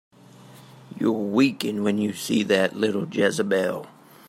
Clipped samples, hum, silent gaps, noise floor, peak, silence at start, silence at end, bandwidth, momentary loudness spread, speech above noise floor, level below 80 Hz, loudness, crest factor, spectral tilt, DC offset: under 0.1%; none; none; -48 dBFS; -6 dBFS; 0.4 s; 0.4 s; 16 kHz; 6 LU; 25 dB; -72 dBFS; -23 LUFS; 18 dB; -5 dB/octave; under 0.1%